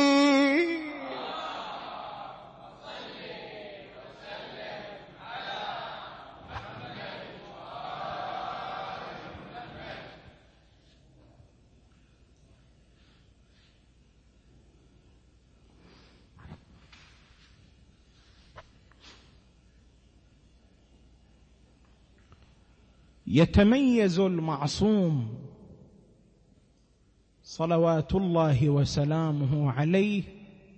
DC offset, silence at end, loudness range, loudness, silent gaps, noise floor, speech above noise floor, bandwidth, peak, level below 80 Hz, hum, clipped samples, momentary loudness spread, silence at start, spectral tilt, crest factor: under 0.1%; 0.3 s; 17 LU; -28 LUFS; none; -64 dBFS; 39 dB; 8.6 kHz; -10 dBFS; -52 dBFS; none; under 0.1%; 22 LU; 0 s; -6.5 dB/octave; 22 dB